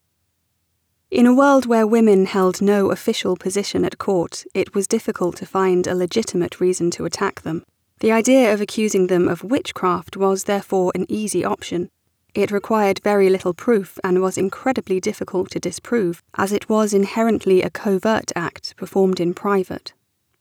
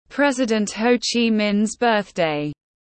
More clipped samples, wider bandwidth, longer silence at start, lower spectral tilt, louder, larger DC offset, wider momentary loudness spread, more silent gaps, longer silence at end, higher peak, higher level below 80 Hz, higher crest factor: neither; first, 17.5 kHz vs 8.8 kHz; first, 1.1 s vs 0.1 s; about the same, -5 dB/octave vs -4 dB/octave; about the same, -19 LUFS vs -20 LUFS; neither; first, 10 LU vs 4 LU; neither; first, 0.5 s vs 0.35 s; about the same, -4 dBFS vs -6 dBFS; about the same, -58 dBFS vs -58 dBFS; about the same, 16 dB vs 16 dB